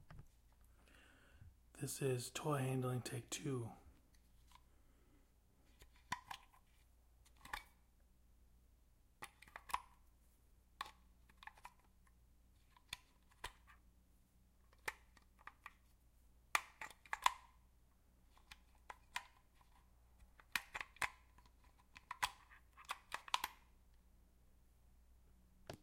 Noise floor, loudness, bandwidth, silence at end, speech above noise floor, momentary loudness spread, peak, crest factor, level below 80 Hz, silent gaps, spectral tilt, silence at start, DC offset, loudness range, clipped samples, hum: -72 dBFS; -46 LUFS; 16 kHz; 0.05 s; 29 dB; 23 LU; -16 dBFS; 36 dB; -70 dBFS; none; -4 dB/octave; 0 s; under 0.1%; 14 LU; under 0.1%; none